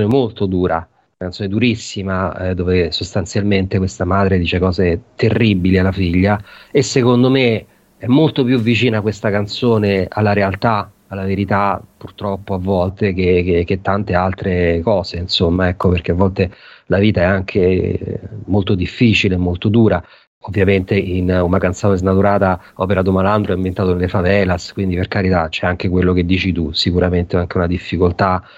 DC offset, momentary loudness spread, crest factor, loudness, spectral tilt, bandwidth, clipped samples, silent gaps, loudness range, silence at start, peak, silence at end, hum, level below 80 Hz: under 0.1%; 7 LU; 14 dB; -16 LUFS; -7 dB/octave; 8.2 kHz; under 0.1%; 20.27-20.41 s; 3 LU; 0 s; 0 dBFS; 0.15 s; none; -38 dBFS